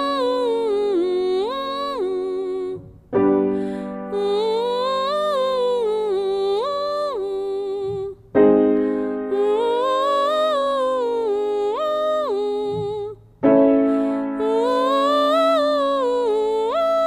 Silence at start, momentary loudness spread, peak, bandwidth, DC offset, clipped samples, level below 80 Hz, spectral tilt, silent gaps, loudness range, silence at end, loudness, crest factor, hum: 0 s; 8 LU; -2 dBFS; 14.5 kHz; under 0.1%; under 0.1%; -56 dBFS; -6 dB/octave; none; 4 LU; 0 s; -20 LUFS; 16 dB; none